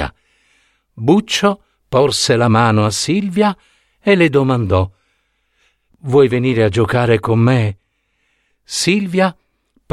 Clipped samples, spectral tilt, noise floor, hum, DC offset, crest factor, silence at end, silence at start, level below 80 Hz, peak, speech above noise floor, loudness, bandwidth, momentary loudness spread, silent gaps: under 0.1%; -5.5 dB/octave; -65 dBFS; none; under 0.1%; 16 dB; 0.6 s; 0 s; -44 dBFS; 0 dBFS; 51 dB; -15 LUFS; 13.5 kHz; 10 LU; none